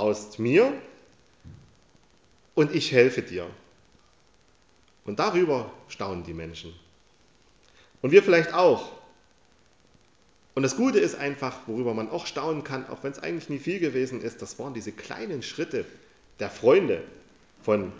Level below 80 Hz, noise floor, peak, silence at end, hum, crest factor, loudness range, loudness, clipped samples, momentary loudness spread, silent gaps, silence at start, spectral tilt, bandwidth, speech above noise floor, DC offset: -60 dBFS; -62 dBFS; -4 dBFS; 0 s; none; 24 dB; 7 LU; -26 LUFS; under 0.1%; 17 LU; none; 0 s; -5.5 dB/octave; 8 kHz; 37 dB; under 0.1%